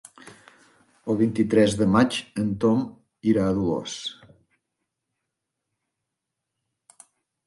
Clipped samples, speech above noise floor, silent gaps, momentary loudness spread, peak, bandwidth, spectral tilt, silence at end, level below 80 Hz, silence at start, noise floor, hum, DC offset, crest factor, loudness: under 0.1%; 61 dB; none; 13 LU; -6 dBFS; 11.5 kHz; -6 dB/octave; 3.35 s; -54 dBFS; 1.05 s; -83 dBFS; none; under 0.1%; 20 dB; -23 LUFS